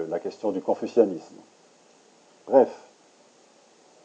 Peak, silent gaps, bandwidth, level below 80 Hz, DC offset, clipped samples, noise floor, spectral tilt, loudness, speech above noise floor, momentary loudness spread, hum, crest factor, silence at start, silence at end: -4 dBFS; none; 8.6 kHz; under -90 dBFS; under 0.1%; under 0.1%; -57 dBFS; -6.5 dB/octave; -24 LUFS; 33 dB; 13 LU; none; 22 dB; 0 s; 1.25 s